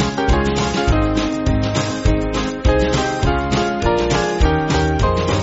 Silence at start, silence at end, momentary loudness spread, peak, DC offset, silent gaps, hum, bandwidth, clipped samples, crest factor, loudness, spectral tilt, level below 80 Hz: 0 s; 0 s; 2 LU; -2 dBFS; under 0.1%; none; none; 8 kHz; under 0.1%; 14 dB; -18 LUFS; -5 dB/octave; -22 dBFS